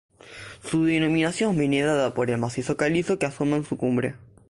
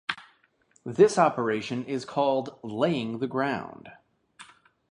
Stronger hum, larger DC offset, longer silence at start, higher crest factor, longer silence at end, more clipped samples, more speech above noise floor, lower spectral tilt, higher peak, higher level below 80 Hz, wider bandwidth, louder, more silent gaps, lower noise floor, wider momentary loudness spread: neither; neither; first, 0.25 s vs 0.1 s; second, 14 dB vs 22 dB; second, 0.3 s vs 0.5 s; neither; second, 20 dB vs 40 dB; about the same, -6 dB/octave vs -5.5 dB/octave; second, -10 dBFS vs -6 dBFS; first, -54 dBFS vs -70 dBFS; about the same, 11.5 kHz vs 11 kHz; about the same, -24 LUFS vs -26 LUFS; neither; second, -43 dBFS vs -66 dBFS; second, 7 LU vs 17 LU